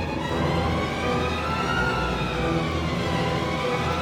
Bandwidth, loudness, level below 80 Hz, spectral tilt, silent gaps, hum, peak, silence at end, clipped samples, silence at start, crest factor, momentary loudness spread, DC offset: 16 kHz; -25 LUFS; -36 dBFS; -5.5 dB/octave; none; none; -12 dBFS; 0 s; under 0.1%; 0 s; 12 dB; 2 LU; under 0.1%